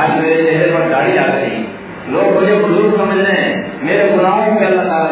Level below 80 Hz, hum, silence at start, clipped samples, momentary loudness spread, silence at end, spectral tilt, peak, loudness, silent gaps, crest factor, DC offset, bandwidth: -52 dBFS; none; 0 s; under 0.1%; 8 LU; 0 s; -10 dB/octave; 0 dBFS; -13 LUFS; none; 12 dB; under 0.1%; 4 kHz